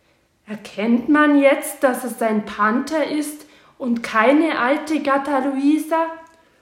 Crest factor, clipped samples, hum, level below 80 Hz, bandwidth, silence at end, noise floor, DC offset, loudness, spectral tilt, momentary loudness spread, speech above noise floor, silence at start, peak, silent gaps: 16 dB; under 0.1%; none; -64 dBFS; 16.5 kHz; 0.35 s; -51 dBFS; under 0.1%; -19 LUFS; -4.5 dB/octave; 15 LU; 33 dB; 0.5 s; -2 dBFS; none